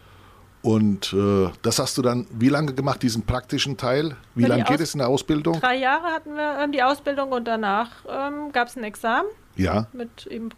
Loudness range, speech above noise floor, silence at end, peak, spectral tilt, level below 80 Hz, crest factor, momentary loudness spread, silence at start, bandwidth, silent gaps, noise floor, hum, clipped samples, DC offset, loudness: 3 LU; 27 dB; 0.05 s; -8 dBFS; -5 dB/octave; -46 dBFS; 14 dB; 8 LU; 0.65 s; 15.5 kHz; none; -50 dBFS; none; under 0.1%; under 0.1%; -23 LUFS